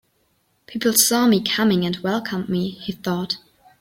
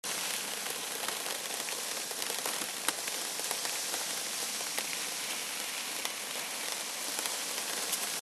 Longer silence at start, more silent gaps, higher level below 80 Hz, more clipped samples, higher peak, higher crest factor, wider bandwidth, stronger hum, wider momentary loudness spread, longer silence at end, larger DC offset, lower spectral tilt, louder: first, 0.7 s vs 0.05 s; neither; first, -58 dBFS vs -88 dBFS; neither; first, 0 dBFS vs -8 dBFS; second, 22 dB vs 28 dB; first, 16.5 kHz vs 13 kHz; neither; first, 13 LU vs 2 LU; first, 0.4 s vs 0 s; neither; first, -3.5 dB/octave vs 1 dB/octave; first, -20 LUFS vs -33 LUFS